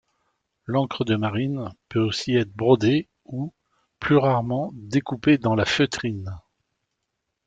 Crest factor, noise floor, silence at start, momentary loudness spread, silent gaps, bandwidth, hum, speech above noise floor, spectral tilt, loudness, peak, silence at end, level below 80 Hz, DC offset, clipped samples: 20 dB; -79 dBFS; 0.7 s; 14 LU; none; 9 kHz; none; 57 dB; -6.5 dB/octave; -23 LUFS; -4 dBFS; 1.1 s; -56 dBFS; under 0.1%; under 0.1%